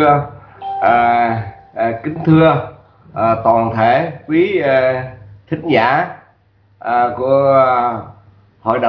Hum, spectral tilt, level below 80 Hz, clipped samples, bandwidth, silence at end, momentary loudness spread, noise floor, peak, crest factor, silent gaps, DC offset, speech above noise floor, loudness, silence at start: none; -9.5 dB/octave; -48 dBFS; under 0.1%; 5.4 kHz; 0 s; 15 LU; -53 dBFS; 0 dBFS; 14 dB; none; under 0.1%; 40 dB; -14 LUFS; 0 s